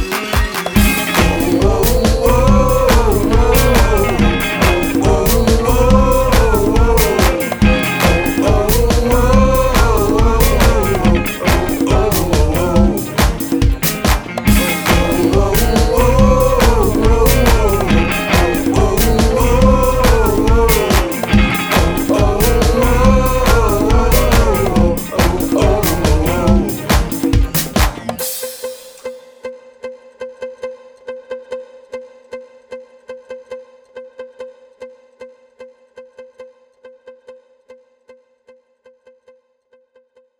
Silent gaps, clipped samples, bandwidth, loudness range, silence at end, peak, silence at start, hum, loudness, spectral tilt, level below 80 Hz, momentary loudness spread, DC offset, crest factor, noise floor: none; under 0.1%; over 20 kHz; 18 LU; 3.1 s; 0 dBFS; 0 s; none; -13 LUFS; -5.5 dB/octave; -18 dBFS; 19 LU; under 0.1%; 14 dB; -56 dBFS